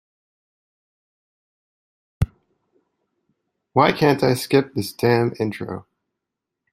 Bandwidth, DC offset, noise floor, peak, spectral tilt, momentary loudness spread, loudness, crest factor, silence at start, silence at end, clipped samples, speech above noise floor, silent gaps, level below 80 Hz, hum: 16 kHz; under 0.1%; -83 dBFS; -2 dBFS; -6 dB/octave; 12 LU; -20 LUFS; 22 dB; 2.2 s; 0.9 s; under 0.1%; 64 dB; none; -46 dBFS; none